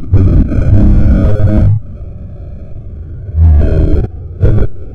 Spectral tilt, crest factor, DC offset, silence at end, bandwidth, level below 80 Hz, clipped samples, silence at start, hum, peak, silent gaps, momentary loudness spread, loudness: -11 dB/octave; 8 dB; under 0.1%; 0 s; 4.4 kHz; -12 dBFS; 1%; 0 s; none; 0 dBFS; none; 19 LU; -11 LUFS